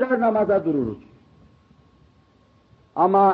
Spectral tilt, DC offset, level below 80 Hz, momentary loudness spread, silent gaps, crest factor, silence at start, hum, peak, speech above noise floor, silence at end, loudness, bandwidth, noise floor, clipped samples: -10 dB/octave; under 0.1%; -58 dBFS; 14 LU; none; 14 dB; 0 s; none; -8 dBFS; 39 dB; 0 s; -21 LUFS; 5.4 kHz; -58 dBFS; under 0.1%